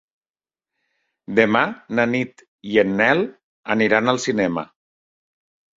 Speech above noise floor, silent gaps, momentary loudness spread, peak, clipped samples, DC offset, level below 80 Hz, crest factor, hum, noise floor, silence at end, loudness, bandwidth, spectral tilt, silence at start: over 71 dB; 2.48-2.58 s, 3.44-3.63 s; 13 LU; 0 dBFS; under 0.1%; under 0.1%; -60 dBFS; 22 dB; none; under -90 dBFS; 1.15 s; -19 LUFS; 7.8 kHz; -5 dB/octave; 1.3 s